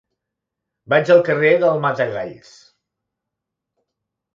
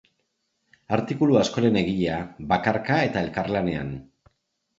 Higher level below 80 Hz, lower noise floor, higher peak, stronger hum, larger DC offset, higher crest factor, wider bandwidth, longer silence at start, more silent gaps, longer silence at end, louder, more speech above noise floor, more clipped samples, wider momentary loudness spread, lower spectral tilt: second, -66 dBFS vs -50 dBFS; first, -82 dBFS vs -75 dBFS; about the same, -2 dBFS vs -4 dBFS; neither; neither; about the same, 20 dB vs 20 dB; about the same, 7.4 kHz vs 7.8 kHz; about the same, 0.9 s vs 0.9 s; neither; first, 2 s vs 0.75 s; first, -16 LUFS vs -24 LUFS; first, 66 dB vs 52 dB; neither; about the same, 12 LU vs 10 LU; about the same, -6.5 dB/octave vs -6.5 dB/octave